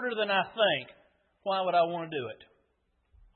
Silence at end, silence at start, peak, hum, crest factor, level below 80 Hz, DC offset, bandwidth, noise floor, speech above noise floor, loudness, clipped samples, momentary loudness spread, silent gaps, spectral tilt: 0.9 s; 0 s; -14 dBFS; none; 18 dB; -70 dBFS; under 0.1%; 4.4 kHz; -74 dBFS; 45 dB; -29 LUFS; under 0.1%; 15 LU; none; -8 dB/octave